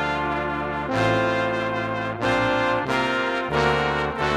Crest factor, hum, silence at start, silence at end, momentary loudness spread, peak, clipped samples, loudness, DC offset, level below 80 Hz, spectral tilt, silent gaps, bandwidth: 20 dB; none; 0 s; 0 s; 5 LU; -4 dBFS; under 0.1%; -23 LUFS; under 0.1%; -44 dBFS; -5.5 dB/octave; none; 13.5 kHz